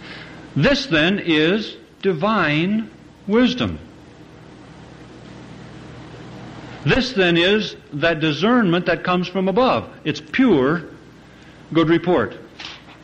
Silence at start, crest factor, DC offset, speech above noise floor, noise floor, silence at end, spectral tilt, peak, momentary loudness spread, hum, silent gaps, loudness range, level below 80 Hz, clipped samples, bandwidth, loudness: 0 s; 16 dB; under 0.1%; 26 dB; -44 dBFS; 0.1 s; -6 dB/octave; -4 dBFS; 21 LU; none; none; 7 LU; -46 dBFS; under 0.1%; 8.4 kHz; -19 LUFS